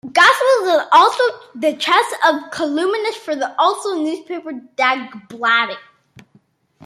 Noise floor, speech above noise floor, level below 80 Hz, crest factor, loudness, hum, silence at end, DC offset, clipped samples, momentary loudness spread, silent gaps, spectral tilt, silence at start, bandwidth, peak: -56 dBFS; 39 dB; -72 dBFS; 16 dB; -16 LUFS; none; 1.05 s; under 0.1%; under 0.1%; 13 LU; none; -2 dB/octave; 0.05 s; 15.5 kHz; 0 dBFS